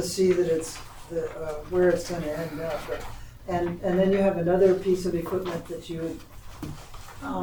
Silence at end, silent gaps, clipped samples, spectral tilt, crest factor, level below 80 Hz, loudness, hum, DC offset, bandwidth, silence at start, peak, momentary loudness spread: 0 s; none; under 0.1%; -6 dB/octave; 18 dB; -46 dBFS; -26 LUFS; none; under 0.1%; over 20 kHz; 0 s; -8 dBFS; 19 LU